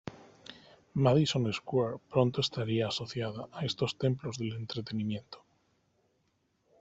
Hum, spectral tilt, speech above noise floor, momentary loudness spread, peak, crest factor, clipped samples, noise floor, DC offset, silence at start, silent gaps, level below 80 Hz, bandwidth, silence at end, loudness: none; -6 dB/octave; 44 dB; 23 LU; -10 dBFS; 22 dB; under 0.1%; -75 dBFS; under 0.1%; 0.05 s; none; -66 dBFS; 8 kHz; 1.45 s; -32 LUFS